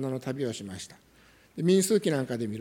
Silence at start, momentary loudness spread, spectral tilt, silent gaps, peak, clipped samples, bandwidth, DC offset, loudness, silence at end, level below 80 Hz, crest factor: 0 s; 19 LU; -5.5 dB/octave; none; -12 dBFS; under 0.1%; 17.5 kHz; under 0.1%; -28 LUFS; 0 s; -68 dBFS; 16 dB